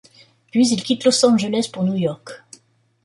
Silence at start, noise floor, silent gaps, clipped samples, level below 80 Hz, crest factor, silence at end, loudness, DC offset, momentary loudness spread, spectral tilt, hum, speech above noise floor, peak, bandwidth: 0.55 s; -57 dBFS; none; under 0.1%; -64 dBFS; 18 dB; 0.7 s; -18 LUFS; under 0.1%; 19 LU; -4.5 dB/octave; none; 39 dB; -2 dBFS; 11.5 kHz